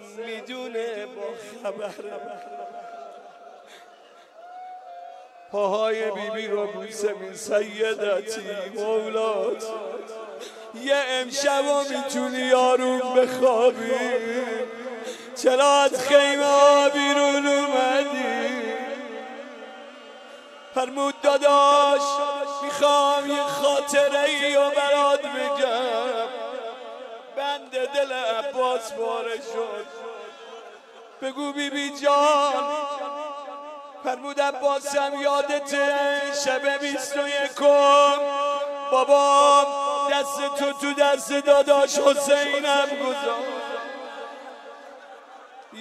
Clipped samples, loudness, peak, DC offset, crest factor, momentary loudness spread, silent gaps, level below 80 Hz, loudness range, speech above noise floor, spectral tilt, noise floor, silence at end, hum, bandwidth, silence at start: under 0.1%; -22 LUFS; -4 dBFS; under 0.1%; 20 dB; 20 LU; none; -80 dBFS; 11 LU; 28 dB; -1.5 dB/octave; -50 dBFS; 0 s; none; 14 kHz; 0 s